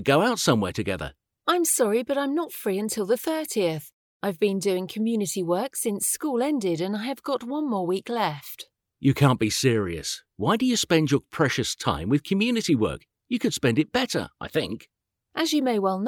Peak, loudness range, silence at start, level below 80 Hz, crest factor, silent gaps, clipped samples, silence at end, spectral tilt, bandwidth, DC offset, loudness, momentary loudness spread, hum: -6 dBFS; 3 LU; 0 s; -56 dBFS; 20 dB; 3.94-4.20 s; under 0.1%; 0 s; -4.5 dB/octave; over 20 kHz; under 0.1%; -25 LUFS; 10 LU; none